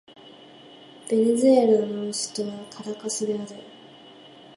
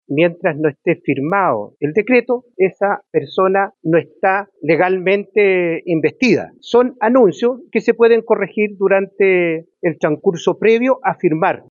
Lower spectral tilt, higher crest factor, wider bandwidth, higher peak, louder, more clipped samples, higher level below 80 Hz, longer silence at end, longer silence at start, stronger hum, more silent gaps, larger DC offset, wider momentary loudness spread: second, -4.5 dB/octave vs -7 dB/octave; about the same, 18 dB vs 14 dB; first, 11.5 kHz vs 7.2 kHz; second, -6 dBFS vs 0 dBFS; second, -23 LUFS vs -16 LUFS; neither; second, -76 dBFS vs -64 dBFS; first, 0.9 s vs 0.1 s; first, 0.25 s vs 0.1 s; neither; neither; neither; first, 19 LU vs 6 LU